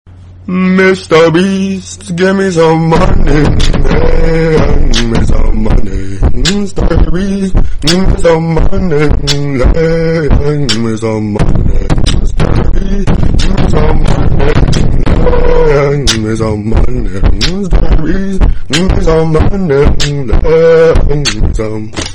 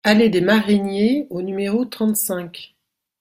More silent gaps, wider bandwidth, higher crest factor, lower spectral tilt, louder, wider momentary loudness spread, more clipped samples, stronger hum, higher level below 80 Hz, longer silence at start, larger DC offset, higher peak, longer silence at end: neither; second, 10.5 kHz vs 16 kHz; second, 6 dB vs 18 dB; first, -6 dB/octave vs -4.5 dB/octave; first, -11 LUFS vs -19 LUFS; second, 7 LU vs 12 LU; neither; neither; first, -10 dBFS vs -58 dBFS; about the same, 0.05 s vs 0.05 s; neither; about the same, 0 dBFS vs -2 dBFS; second, 0 s vs 0.55 s